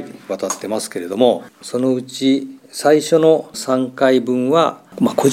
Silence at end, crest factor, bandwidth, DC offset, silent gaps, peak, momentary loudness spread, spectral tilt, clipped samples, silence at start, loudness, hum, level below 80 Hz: 0 s; 16 dB; 16 kHz; under 0.1%; none; 0 dBFS; 10 LU; -5 dB/octave; under 0.1%; 0 s; -17 LUFS; none; -70 dBFS